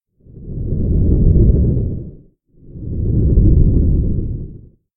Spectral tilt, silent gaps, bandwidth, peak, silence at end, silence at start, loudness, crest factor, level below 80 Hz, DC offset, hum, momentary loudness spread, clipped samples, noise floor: -16.5 dB/octave; none; 1.2 kHz; 0 dBFS; 0.4 s; 0.35 s; -16 LUFS; 14 dB; -18 dBFS; under 0.1%; none; 18 LU; under 0.1%; -46 dBFS